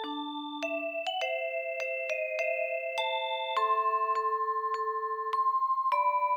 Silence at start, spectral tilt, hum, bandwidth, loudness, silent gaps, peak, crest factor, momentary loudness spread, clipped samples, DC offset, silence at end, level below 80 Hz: 0 s; -1 dB/octave; none; over 20 kHz; -30 LUFS; none; -18 dBFS; 14 dB; 6 LU; under 0.1%; under 0.1%; 0 s; -82 dBFS